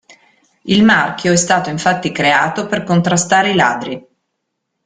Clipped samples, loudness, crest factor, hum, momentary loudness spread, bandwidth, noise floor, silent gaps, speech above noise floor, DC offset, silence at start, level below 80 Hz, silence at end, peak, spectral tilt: under 0.1%; -14 LUFS; 14 dB; none; 10 LU; 9.6 kHz; -73 dBFS; none; 59 dB; under 0.1%; 0.65 s; -52 dBFS; 0.85 s; 0 dBFS; -4 dB/octave